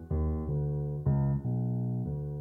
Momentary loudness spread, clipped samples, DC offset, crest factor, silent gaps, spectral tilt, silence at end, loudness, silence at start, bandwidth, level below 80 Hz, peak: 4 LU; under 0.1%; under 0.1%; 12 dB; none; -13 dB/octave; 0 s; -32 LUFS; 0 s; 2.1 kHz; -40 dBFS; -18 dBFS